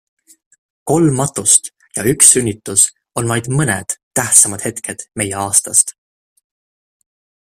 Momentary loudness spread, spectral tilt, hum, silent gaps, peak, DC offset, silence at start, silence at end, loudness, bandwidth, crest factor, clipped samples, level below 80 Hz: 14 LU; -3 dB/octave; none; 4.03-4.11 s; 0 dBFS; under 0.1%; 0.85 s; 1.65 s; -13 LUFS; over 20 kHz; 16 dB; 0.2%; -50 dBFS